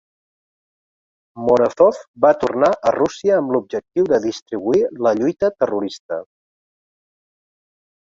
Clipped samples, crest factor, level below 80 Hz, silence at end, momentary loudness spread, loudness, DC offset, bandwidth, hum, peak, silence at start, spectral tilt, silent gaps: under 0.1%; 18 dB; -58 dBFS; 1.8 s; 9 LU; -18 LUFS; under 0.1%; 7.8 kHz; none; -2 dBFS; 1.35 s; -6 dB/octave; 2.08-2.14 s, 4.42-4.46 s, 5.99-6.09 s